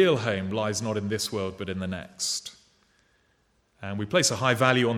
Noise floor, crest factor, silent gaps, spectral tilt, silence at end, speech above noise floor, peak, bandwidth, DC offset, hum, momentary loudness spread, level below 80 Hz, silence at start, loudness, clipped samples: -68 dBFS; 22 dB; none; -4 dB/octave; 0 s; 42 dB; -6 dBFS; 17.5 kHz; under 0.1%; none; 12 LU; -64 dBFS; 0 s; -27 LUFS; under 0.1%